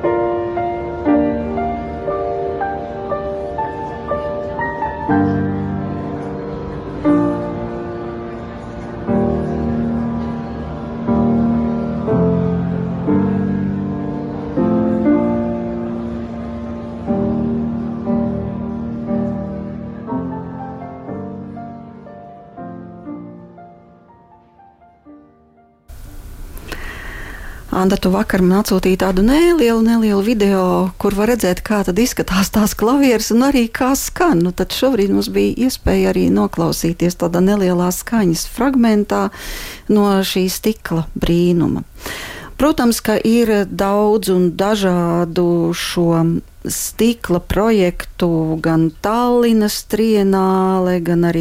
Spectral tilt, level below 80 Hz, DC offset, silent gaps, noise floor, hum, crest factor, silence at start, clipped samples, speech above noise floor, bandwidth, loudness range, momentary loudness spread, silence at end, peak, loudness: -6 dB/octave; -34 dBFS; under 0.1%; none; -51 dBFS; none; 14 dB; 0 s; under 0.1%; 36 dB; 16.5 kHz; 11 LU; 15 LU; 0 s; -4 dBFS; -17 LUFS